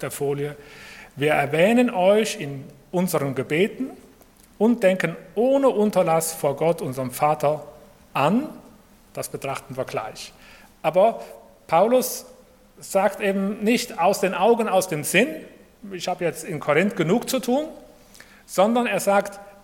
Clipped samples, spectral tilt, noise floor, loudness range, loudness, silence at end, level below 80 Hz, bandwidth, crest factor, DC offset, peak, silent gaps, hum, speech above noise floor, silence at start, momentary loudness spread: under 0.1%; -5 dB/octave; -52 dBFS; 4 LU; -22 LUFS; 0.15 s; -60 dBFS; 17.5 kHz; 22 dB; under 0.1%; -2 dBFS; none; none; 30 dB; 0 s; 15 LU